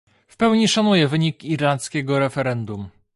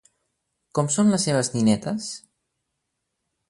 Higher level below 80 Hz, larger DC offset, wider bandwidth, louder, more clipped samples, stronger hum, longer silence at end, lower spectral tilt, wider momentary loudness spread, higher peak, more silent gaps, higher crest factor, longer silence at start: about the same, -56 dBFS vs -60 dBFS; neither; about the same, 11.5 kHz vs 11.5 kHz; about the same, -20 LUFS vs -22 LUFS; neither; neither; second, 0.25 s vs 1.3 s; about the same, -5 dB/octave vs -5 dB/octave; about the same, 10 LU vs 12 LU; about the same, -4 dBFS vs -6 dBFS; neither; about the same, 16 dB vs 18 dB; second, 0.4 s vs 0.75 s